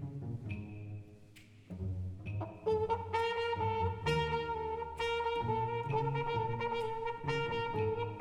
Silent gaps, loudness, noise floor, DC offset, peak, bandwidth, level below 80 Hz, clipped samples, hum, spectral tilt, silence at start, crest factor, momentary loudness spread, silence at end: none; -36 LUFS; -57 dBFS; under 0.1%; -20 dBFS; 11 kHz; -56 dBFS; under 0.1%; none; -6.5 dB/octave; 0 s; 16 dB; 10 LU; 0 s